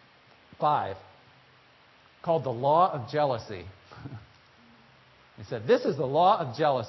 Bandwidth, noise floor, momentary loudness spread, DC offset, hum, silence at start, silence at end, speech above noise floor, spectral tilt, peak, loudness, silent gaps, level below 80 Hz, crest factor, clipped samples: 6 kHz; -58 dBFS; 22 LU; under 0.1%; none; 0.6 s; 0 s; 32 dB; -7 dB/octave; -10 dBFS; -27 LUFS; none; -64 dBFS; 18 dB; under 0.1%